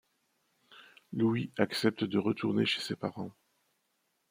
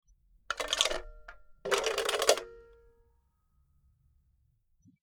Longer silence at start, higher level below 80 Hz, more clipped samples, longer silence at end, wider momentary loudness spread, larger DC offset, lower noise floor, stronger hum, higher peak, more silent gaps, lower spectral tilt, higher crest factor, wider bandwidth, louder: first, 0.7 s vs 0.5 s; second, -76 dBFS vs -56 dBFS; neither; second, 1 s vs 2.4 s; second, 11 LU vs 16 LU; neither; first, -78 dBFS vs -71 dBFS; neither; second, -12 dBFS vs -6 dBFS; neither; first, -6 dB/octave vs 0 dB/octave; second, 22 dB vs 30 dB; second, 16.5 kHz vs over 20 kHz; about the same, -32 LUFS vs -30 LUFS